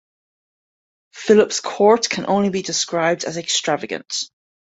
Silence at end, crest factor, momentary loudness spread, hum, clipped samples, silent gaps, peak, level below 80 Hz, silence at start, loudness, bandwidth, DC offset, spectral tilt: 0.45 s; 18 dB; 11 LU; none; under 0.1%; none; -2 dBFS; -62 dBFS; 1.15 s; -19 LUFS; 8.2 kHz; under 0.1%; -3 dB/octave